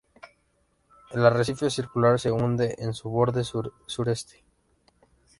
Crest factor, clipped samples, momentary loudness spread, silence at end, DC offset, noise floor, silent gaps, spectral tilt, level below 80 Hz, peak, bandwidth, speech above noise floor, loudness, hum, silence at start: 22 dB; under 0.1%; 11 LU; 1.15 s; under 0.1%; -69 dBFS; none; -6 dB/octave; -56 dBFS; -4 dBFS; 11.5 kHz; 44 dB; -26 LUFS; none; 0.25 s